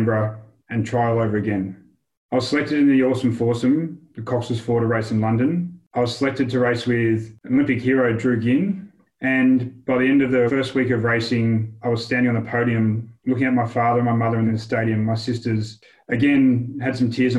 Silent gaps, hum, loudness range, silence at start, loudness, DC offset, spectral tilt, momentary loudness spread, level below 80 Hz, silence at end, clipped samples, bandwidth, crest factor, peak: 2.17-2.29 s, 5.87-5.91 s; none; 2 LU; 0 s; -21 LUFS; under 0.1%; -7.5 dB/octave; 9 LU; -56 dBFS; 0 s; under 0.1%; 11 kHz; 14 dB; -6 dBFS